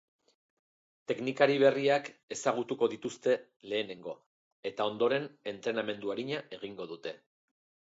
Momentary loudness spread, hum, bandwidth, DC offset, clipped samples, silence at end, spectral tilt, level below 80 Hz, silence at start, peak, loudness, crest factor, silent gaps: 17 LU; none; 8 kHz; under 0.1%; under 0.1%; 0.75 s; -4.5 dB/octave; -80 dBFS; 1.1 s; -10 dBFS; -32 LUFS; 24 dB; 2.23-2.28 s, 3.56-3.60 s, 4.26-4.63 s